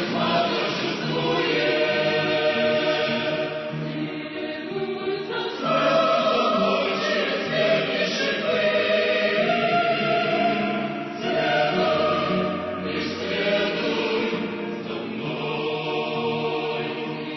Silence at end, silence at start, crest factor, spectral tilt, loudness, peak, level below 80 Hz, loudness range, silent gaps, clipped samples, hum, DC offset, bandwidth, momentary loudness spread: 0 s; 0 s; 14 dB; -5.5 dB/octave; -23 LUFS; -10 dBFS; -64 dBFS; 4 LU; none; under 0.1%; none; under 0.1%; 6.2 kHz; 9 LU